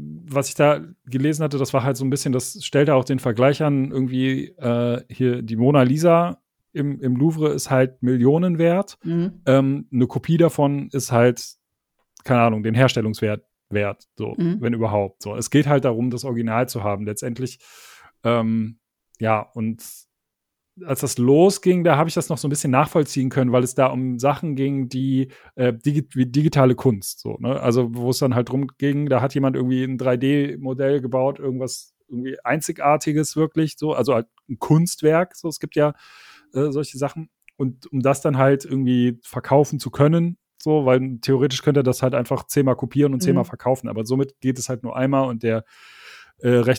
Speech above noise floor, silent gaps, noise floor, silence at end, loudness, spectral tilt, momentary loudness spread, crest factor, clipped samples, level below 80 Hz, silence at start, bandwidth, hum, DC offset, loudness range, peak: 61 dB; none; -81 dBFS; 0 s; -21 LUFS; -6.5 dB/octave; 10 LU; 20 dB; under 0.1%; -60 dBFS; 0 s; 17.5 kHz; none; under 0.1%; 4 LU; -2 dBFS